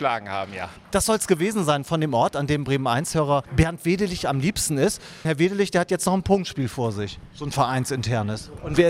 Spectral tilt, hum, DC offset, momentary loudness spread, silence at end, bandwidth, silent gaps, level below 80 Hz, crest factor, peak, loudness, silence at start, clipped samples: -5 dB/octave; none; under 0.1%; 9 LU; 0 s; 16 kHz; none; -42 dBFS; 18 dB; -4 dBFS; -23 LUFS; 0 s; under 0.1%